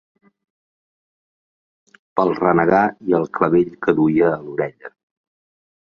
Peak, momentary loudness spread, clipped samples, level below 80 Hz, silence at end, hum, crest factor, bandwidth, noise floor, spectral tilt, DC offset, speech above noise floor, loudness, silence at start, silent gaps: -2 dBFS; 10 LU; under 0.1%; -56 dBFS; 1.1 s; none; 18 dB; 6.6 kHz; under -90 dBFS; -9.5 dB/octave; under 0.1%; over 73 dB; -18 LUFS; 2.15 s; none